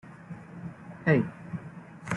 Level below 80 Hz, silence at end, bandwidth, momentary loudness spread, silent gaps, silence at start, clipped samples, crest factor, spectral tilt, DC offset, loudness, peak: -64 dBFS; 0 s; 11 kHz; 20 LU; none; 0.05 s; under 0.1%; 22 dB; -8 dB/octave; under 0.1%; -29 LUFS; -8 dBFS